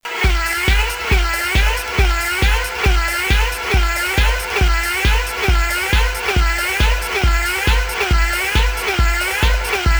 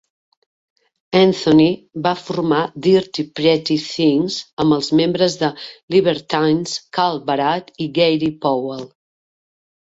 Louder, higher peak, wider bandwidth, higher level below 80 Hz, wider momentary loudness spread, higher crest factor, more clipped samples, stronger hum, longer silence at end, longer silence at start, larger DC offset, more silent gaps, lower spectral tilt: about the same, -17 LUFS vs -17 LUFS; about the same, -2 dBFS vs -2 dBFS; first, over 20 kHz vs 8 kHz; first, -18 dBFS vs -56 dBFS; second, 1 LU vs 9 LU; about the same, 14 dB vs 16 dB; neither; neither; second, 0 s vs 1 s; second, 0.05 s vs 1.1 s; neither; second, none vs 4.53-4.57 s, 5.83-5.88 s; second, -3.5 dB/octave vs -5.5 dB/octave